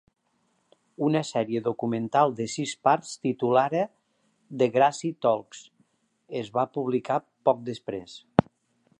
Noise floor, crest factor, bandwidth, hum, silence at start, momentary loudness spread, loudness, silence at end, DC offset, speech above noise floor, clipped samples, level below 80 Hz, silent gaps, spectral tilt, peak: -71 dBFS; 26 dB; 11 kHz; none; 1 s; 12 LU; -26 LUFS; 0.6 s; under 0.1%; 46 dB; under 0.1%; -64 dBFS; none; -6 dB/octave; 0 dBFS